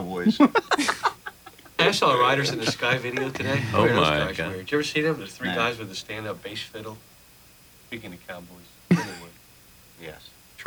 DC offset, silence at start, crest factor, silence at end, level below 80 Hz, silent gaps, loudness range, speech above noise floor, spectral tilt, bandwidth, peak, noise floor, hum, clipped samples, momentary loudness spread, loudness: under 0.1%; 0 s; 22 dB; 0 s; -54 dBFS; none; 10 LU; 28 dB; -4.5 dB/octave; over 20 kHz; -4 dBFS; -52 dBFS; none; under 0.1%; 21 LU; -24 LUFS